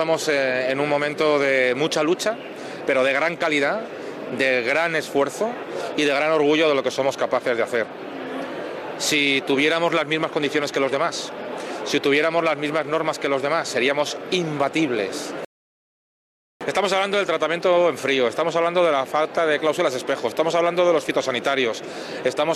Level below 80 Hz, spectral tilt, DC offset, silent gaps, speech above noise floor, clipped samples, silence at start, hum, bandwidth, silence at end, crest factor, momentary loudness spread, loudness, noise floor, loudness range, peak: -70 dBFS; -3.5 dB/octave; under 0.1%; 15.46-16.60 s; over 69 dB; under 0.1%; 0 s; none; 14.5 kHz; 0 s; 14 dB; 11 LU; -21 LUFS; under -90 dBFS; 3 LU; -8 dBFS